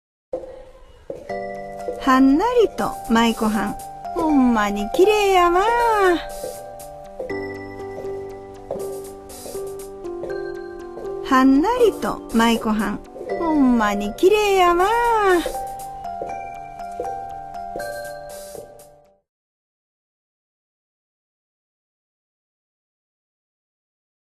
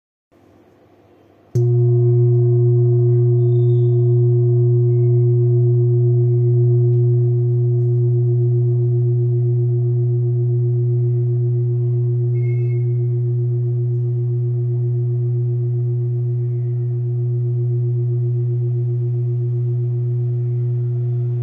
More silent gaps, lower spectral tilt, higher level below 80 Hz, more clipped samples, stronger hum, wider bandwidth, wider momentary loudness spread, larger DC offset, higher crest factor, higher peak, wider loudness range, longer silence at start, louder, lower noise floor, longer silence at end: neither; second, -4.5 dB/octave vs -13 dB/octave; first, -44 dBFS vs -64 dBFS; neither; neither; first, 14 kHz vs 2.3 kHz; first, 18 LU vs 6 LU; neither; first, 18 dB vs 8 dB; first, -4 dBFS vs -8 dBFS; first, 14 LU vs 5 LU; second, 0.35 s vs 1.55 s; about the same, -19 LUFS vs -18 LUFS; about the same, -49 dBFS vs -50 dBFS; first, 5.45 s vs 0 s